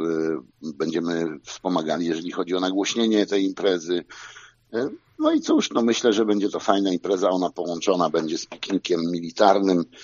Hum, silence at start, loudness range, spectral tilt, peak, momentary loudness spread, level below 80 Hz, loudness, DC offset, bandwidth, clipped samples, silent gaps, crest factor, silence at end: none; 0 s; 3 LU; -4 dB/octave; -2 dBFS; 9 LU; -68 dBFS; -23 LUFS; under 0.1%; 7.4 kHz; under 0.1%; none; 22 dB; 0 s